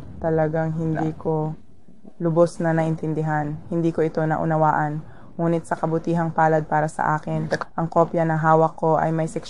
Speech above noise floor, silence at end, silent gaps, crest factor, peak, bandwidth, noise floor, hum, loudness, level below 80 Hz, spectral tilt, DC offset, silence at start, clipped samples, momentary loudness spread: 28 dB; 0 s; none; 18 dB; -4 dBFS; 10.5 kHz; -49 dBFS; none; -22 LUFS; -52 dBFS; -8 dB/octave; 1%; 0 s; under 0.1%; 7 LU